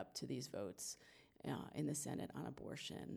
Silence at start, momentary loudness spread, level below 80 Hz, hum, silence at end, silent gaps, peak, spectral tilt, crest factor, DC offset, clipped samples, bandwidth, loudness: 0 s; 7 LU; -76 dBFS; none; 0 s; none; -32 dBFS; -4.5 dB/octave; 16 dB; under 0.1%; under 0.1%; over 20 kHz; -48 LUFS